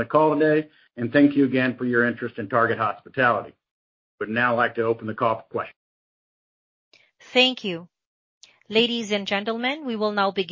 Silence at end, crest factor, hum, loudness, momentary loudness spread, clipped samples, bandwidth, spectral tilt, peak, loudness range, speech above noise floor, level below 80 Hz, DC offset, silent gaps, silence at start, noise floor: 0 s; 20 dB; none; -22 LUFS; 12 LU; under 0.1%; 7.6 kHz; -5.5 dB/octave; -4 dBFS; 5 LU; over 68 dB; -66 dBFS; under 0.1%; 3.71-4.18 s, 5.76-6.91 s, 8.06-8.41 s; 0 s; under -90 dBFS